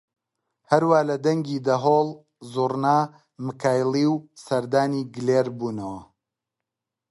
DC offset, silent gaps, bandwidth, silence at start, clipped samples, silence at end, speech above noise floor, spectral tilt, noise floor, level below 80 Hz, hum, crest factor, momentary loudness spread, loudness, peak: under 0.1%; none; 11.5 kHz; 0.7 s; under 0.1%; 1.05 s; 63 dB; -6.5 dB/octave; -86 dBFS; -66 dBFS; none; 20 dB; 13 LU; -23 LUFS; -4 dBFS